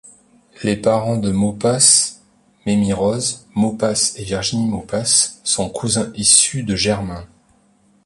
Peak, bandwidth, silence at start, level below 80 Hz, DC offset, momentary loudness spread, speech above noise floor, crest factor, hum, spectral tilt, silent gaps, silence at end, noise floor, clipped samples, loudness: 0 dBFS; 11.5 kHz; 0.6 s; -46 dBFS; under 0.1%; 11 LU; 39 dB; 18 dB; none; -3 dB/octave; none; 0.8 s; -56 dBFS; under 0.1%; -16 LUFS